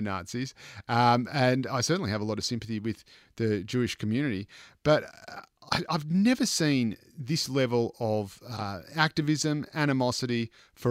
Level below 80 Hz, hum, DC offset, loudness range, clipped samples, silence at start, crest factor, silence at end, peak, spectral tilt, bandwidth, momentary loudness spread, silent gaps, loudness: -62 dBFS; none; under 0.1%; 3 LU; under 0.1%; 0 s; 22 dB; 0 s; -8 dBFS; -5 dB/octave; 16 kHz; 13 LU; none; -28 LUFS